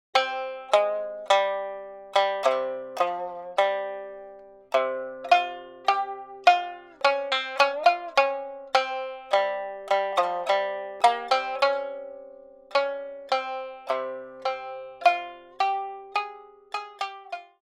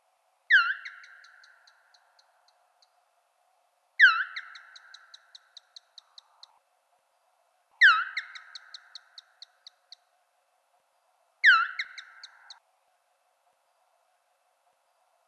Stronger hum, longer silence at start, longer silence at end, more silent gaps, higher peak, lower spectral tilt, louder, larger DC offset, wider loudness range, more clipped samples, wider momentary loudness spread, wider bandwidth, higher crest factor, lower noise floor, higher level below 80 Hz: neither; second, 0.15 s vs 0.5 s; second, 0.2 s vs 3.45 s; neither; first, -2 dBFS vs -8 dBFS; first, -1 dB/octave vs 7.5 dB/octave; second, -26 LUFS vs -22 LUFS; neither; second, 5 LU vs 8 LU; neither; second, 13 LU vs 28 LU; first, 13 kHz vs 8.6 kHz; about the same, 24 dB vs 24 dB; second, -47 dBFS vs -72 dBFS; first, -74 dBFS vs under -90 dBFS